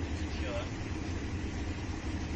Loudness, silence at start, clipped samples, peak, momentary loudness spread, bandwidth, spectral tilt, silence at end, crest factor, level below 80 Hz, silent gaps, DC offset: -37 LUFS; 0 s; under 0.1%; -22 dBFS; 2 LU; 8.4 kHz; -6 dB/octave; 0 s; 12 dB; -42 dBFS; none; under 0.1%